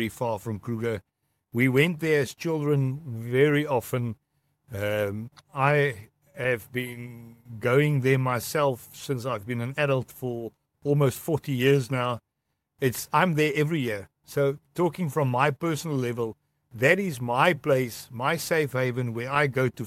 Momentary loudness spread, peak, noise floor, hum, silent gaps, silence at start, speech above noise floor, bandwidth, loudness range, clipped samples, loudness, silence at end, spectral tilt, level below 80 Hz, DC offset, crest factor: 12 LU; -4 dBFS; -80 dBFS; none; none; 0 s; 54 dB; 16 kHz; 3 LU; under 0.1%; -26 LUFS; 0 s; -6 dB/octave; -64 dBFS; under 0.1%; 22 dB